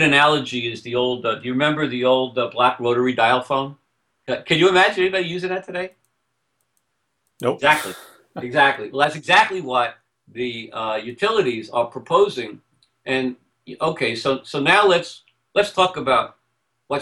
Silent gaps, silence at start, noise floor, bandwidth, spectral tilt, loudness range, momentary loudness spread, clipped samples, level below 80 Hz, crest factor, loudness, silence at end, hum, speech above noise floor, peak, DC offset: none; 0 s; -73 dBFS; 16 kHz; -4.5 dB/octave; 4 LU; 14 LU; under 0.1%; -60 dBFS; 18 dB; -19 LUFS; 0 s; none; 54 dB; -2 dBFS; under 0.1%